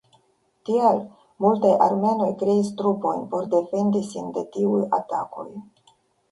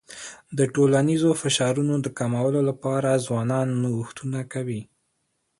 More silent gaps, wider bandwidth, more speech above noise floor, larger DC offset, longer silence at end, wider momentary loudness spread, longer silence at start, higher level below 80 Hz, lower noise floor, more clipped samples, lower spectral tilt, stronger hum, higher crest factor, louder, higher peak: neither; about the same, 11.5 kHz vs 11.5 kHz; second, 42 dB vs 51 dB; neither; about the same, 0.7 s vs 0.75 s; about the same, 14 LU vs 12 LU; first, 0.65 s vs 0.1 s; second, -68 dBFS vs -62 dBFS; second, -64 dBFS vs -74 dBFS; neither; first, -8 dB/octave vs -5.5 dB/octave; neither; about the same, 18 dB vs 16 dB; about the same, -22 LUFS vs -24 LUFS; first, -4 dBFS vs -8 dBFS